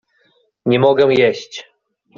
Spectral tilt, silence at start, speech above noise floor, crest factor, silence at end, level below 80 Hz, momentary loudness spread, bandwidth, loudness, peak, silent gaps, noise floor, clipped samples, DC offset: -6 dB/octave; 0.65 s; 46 dB; 14 dB; 0.55 s; -58 dBFS; 19 LU; 7.2 kHz; -14 LUFS; -2 dBFS; none; -60 dBFS; under 0.1%; under 0.1%